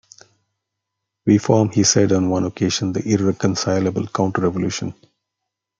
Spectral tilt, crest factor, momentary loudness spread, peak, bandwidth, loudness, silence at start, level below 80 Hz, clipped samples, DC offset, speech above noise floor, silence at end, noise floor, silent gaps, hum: -5 dB/octave; 18 dB; 8 LU; -2 dBFS; 9.4 kHz; -19 LUFS; 1.25 s; -58 dBFS; under 0.1%; under 0.1%; 63 dB; 0.9 s; -81 dBFS; none; none